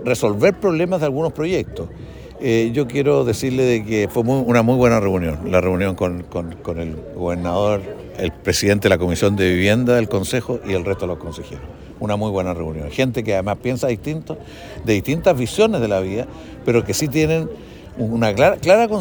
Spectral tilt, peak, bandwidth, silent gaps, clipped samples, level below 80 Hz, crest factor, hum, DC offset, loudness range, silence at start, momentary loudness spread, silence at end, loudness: -6 dB/octave; -2 dBFS; over 20 kHz; none; under 0.1%; -42 dBFS; 18 dB; none; under 0.1%; 5 LU; 0 s; 14 LU; 0 s; -19 LUFS